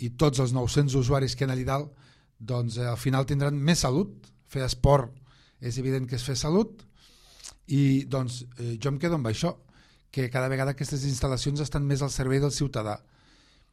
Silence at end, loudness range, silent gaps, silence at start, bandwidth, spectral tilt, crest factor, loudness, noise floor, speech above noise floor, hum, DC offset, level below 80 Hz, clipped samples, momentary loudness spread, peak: 0.75 s; 3 LU; none; 0 s; 13 kHz; -6 dB/octave; 20 dB; -27 LUFS; -59 dBFS; 33 dB; none; under 0.1%; -44 dBFS; under 0.1%; 12 LU; -8 dBFS